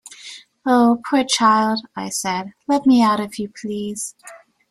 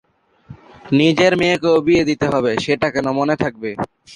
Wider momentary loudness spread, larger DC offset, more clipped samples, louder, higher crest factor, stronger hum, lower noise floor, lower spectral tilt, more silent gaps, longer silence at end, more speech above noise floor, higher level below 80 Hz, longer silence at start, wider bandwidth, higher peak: first, 14 LU vs 9 LU; neither; neither; about the same, -19 LUFS vs -17 LUFS; about the same, 16 dB vs 16 dB; neither; about the same, -40 dBFS vs -43 dBFS; second, -3.5 dB/octave vs -5.5 dB/octave; neither; first, 0.35 s vs 0 s; second, 22 dB vs 27 dB; second, -62 dBFS vs -48 dBFS; second, 0.05 s vs 0.5 s; first, 13 kHz vs 10.5 kHz; about the same, -2 dBFS vs -2 dBFS